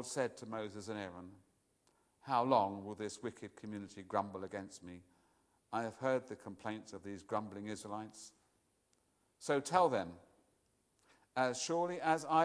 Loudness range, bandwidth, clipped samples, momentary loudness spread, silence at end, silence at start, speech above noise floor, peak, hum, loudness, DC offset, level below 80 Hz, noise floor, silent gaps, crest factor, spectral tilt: 6 LU; 11 kHz; under 0.1%; 18 LU; 0 s; 0 s; 39 dB; -16 dBFS; none; -39 LUFS; under 0.1%; -80 dBFS; -78 dBFS; none; 24 dB; -4.5 dB/octave